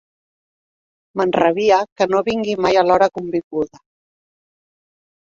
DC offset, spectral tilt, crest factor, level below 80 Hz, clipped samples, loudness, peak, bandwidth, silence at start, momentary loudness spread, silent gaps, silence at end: under 0.1%; -5.5 dB/octave; 18 dB; -56 dBFS; under 0.1%; -17 LUFS; -2 dBFS; 7.6 kHz; 1.15 s; 11 LU; 1.92-1.96 s, 3.44-3.51 s; 1.6 s